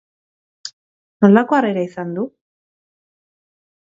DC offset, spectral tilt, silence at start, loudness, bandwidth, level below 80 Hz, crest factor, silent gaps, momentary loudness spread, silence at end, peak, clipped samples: under 0.1%; -7.5 dB/octave; 0.65 s; -16 LUFS; 7.6 kHz; -66 dBFS; 20 dB; 0.73-1.20 s; 22 LU; 1.6 s; 0 dBFS; under 0.1%